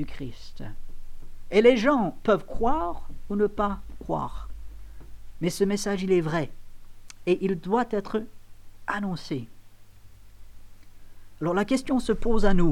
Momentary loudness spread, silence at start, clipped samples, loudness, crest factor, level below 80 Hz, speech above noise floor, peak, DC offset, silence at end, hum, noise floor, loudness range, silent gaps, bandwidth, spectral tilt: 20 LU; 0 s; under 0.1%; -26 LUFS; 20 dB; -36 dBFS; 26 dB; -6 dBFS; 0.3%; 0 s; 50 Hz at -50 dBFS; -49 dBFS; 8 LU; none; 12.5 kHz; -6 dB/octave